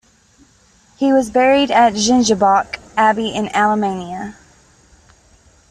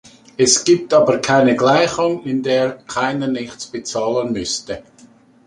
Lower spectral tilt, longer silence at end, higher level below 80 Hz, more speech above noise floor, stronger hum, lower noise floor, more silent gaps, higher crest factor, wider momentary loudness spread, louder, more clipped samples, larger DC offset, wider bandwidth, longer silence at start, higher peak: about the same, -3.5 dB/octave vs -3.5 dB/octave; first, 1.4 s vs 0.65 s; about the same, -50 dBFS vs -54 dBFS; first, 38 dB vs 31 dB; neither; first, -52 dBFS vs -48 dBFS; neither; about the same, 14 dB vs 16 dB; about the same, 12 LU vs 13 LU; about the same, -15 LUFS vs -17 LUFS; neither; neither; about the same, 11.5 kHz vs 11.5 kHz; first, 1 s vs 0.4 s; about the same, -2 dBFS vs 0 dBFS